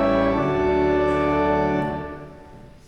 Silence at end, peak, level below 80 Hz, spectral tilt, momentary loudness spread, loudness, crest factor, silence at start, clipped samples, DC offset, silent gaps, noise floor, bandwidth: 0.2 s; -8 dBFS; -38 dBFS; -8 dB/octave; 15 LU; -21 LUFS; 14 dB; 0 s; under 0.1%; under 0.1%; none; -43 dBFS; 8.6 kHz